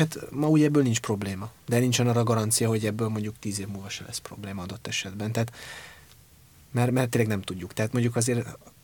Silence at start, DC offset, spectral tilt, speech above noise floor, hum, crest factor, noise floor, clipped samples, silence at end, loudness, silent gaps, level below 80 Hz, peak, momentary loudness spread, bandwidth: 0 s; under 0.1%; -5 dB/octave; 28 dB; none; 18 dB; -54 dBFS; under 0.1%; 0.15 s; -27 LUFS; none; -60 dBFS; -10 dBFS; 13 LU; 19 kHz